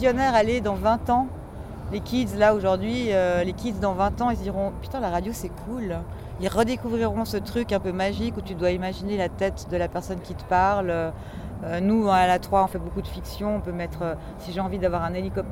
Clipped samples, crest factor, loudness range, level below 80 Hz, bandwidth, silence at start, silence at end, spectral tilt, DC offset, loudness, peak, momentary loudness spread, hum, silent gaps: under 0.1%; 18 dB; 4 LU; -40 dBFS; 16.5 kHz; 0 s; 0 s; -6.5 dB/octave; under 0.1%; -25 LUFS; -6 dBFS; 12 LU; none; none